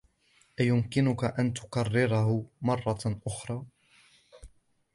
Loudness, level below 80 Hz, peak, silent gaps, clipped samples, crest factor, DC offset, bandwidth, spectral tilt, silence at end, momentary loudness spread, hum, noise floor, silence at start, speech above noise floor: -29 LUFS; -56 dBFS; -12 dBFS; none; under 0.1%; 18 dB; under 0.1%; 11.5 kHz; -6.5 dB/octave; 0.5 s; 10 LU; none; -66 dBFS; 0.6 s; 38 dB